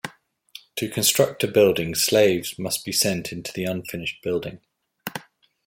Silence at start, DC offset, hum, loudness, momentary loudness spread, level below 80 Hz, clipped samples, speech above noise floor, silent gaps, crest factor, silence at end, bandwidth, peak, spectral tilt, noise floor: 0.05 s; under 0.1%; none; -22 LUFS; 16 LU; -58 dBFS; under 0.1%; 25 dB; none; 20 dB; 0.45 s; 16.5 kHz; -4 dBFS; -3 dB/octave; -48 dBFS